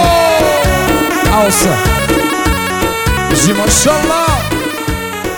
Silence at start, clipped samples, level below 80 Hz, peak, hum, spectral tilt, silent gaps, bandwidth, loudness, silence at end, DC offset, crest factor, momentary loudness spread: 0 s; under 0.1%; -22 dBFS; 0 dBFS; none; -4 dB/octave; none; over 20 kHz; -11 LUFS; 0 s; 0.2%; 12 dB; 7 LU